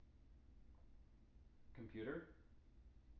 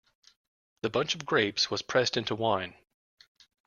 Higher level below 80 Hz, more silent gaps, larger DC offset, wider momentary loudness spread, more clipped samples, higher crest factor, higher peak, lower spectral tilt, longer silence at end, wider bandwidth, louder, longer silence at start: about the same, -68 dBFS vs -68 dBFS; neither; neither; first, 20 LU vs 6 LU; neither; about the same, 22 dB vs 22 dB; second, -36 dBFS vs -10 dBFS; first, -6 dB/octave vs -3.5 dB/octave; second, 0 s vs 0.95 s; second, 5.8 kHz vs 7.4 kHz; second, -53 LUFS vs -29 LUFS; second, 0 s vs 0.85 s